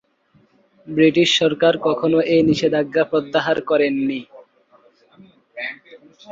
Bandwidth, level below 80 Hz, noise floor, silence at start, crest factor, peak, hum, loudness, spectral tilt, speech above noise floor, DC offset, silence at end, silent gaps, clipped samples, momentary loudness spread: 7.8 kHz; -58 dBFS; -58 dBFS; 0.85 s; 16 dB; -2 dBFS; none; -18 LUFS; -5 dB/octave; 41 dB; under 0.1%; 0 s; none; under 0.1%; 15 LU